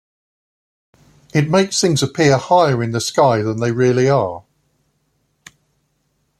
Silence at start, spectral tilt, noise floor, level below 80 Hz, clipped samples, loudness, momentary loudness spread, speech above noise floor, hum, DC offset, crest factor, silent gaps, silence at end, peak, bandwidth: 1.35 s; -5 dB/octave; -66 dBFS; -56 dBFS; under 0.1%; -16 LUFS; 6 LU; 51 dB; none; under 0.1%; 18 dB; none; 2 s; 0 dBFS; 13.5 kHz